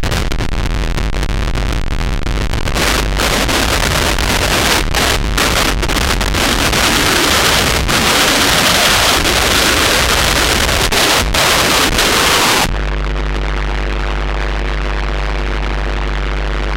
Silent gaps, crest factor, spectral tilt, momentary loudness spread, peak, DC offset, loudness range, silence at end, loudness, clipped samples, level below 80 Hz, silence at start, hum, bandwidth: none; 14 dB; -2.5 dB/octave; 10 LU; 0 dBFS; under 0.1%; 8 LU; 0 s; -13 LUFS; under 0.1%; -18 dBFS; 0 s; none; 17.5 kHz